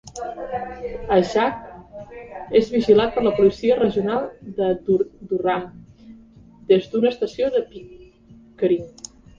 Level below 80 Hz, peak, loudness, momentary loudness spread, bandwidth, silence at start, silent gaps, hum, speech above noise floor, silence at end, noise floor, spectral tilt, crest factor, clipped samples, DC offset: -50 dBFS; -4 dBFS; -21 LUFS; 20 LU; 7.6 kHz; 0.05 s; none; none; 29 dB; 0.5 s; -49 dBFS; -6 dB/octave; 18 dB; under 0.1%; under 0.1%